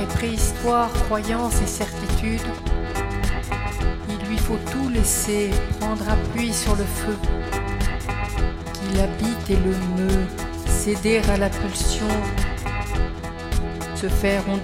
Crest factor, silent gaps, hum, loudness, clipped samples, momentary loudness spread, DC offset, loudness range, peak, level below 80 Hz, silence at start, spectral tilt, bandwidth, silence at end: 16 dB; none; none; -24 LUFS; under 0.1%; 7 LU; 0.1%; 2 LU; -6 dBFS; -26 dBFS; 0 s; -5 dB/octave; 16.5 kHz; 0 s